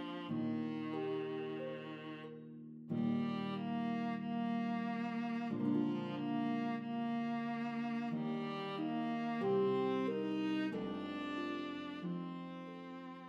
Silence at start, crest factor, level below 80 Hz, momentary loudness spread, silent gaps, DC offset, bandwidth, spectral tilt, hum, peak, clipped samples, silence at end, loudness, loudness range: 0 s; 14 dB; -84 dBFS; 11 LU; none; under 0.1%; 7.2 kHz; -8 dB/octave; none; -24 dBFS; under 0.1%; 0 s; -39 LUFS; 3 LU